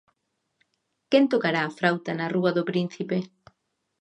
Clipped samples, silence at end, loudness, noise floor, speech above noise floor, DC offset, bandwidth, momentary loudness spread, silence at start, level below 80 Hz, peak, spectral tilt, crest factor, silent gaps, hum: under 0.1%; 0.75 s; -25 LUFS; -77 dBFS; 53 dB; under 0.1%; 9.6 kHz; 8 LU; 1.1 s; -76 dBFS; -6 dBFS; -7 dB/octave; 22 dB; none; none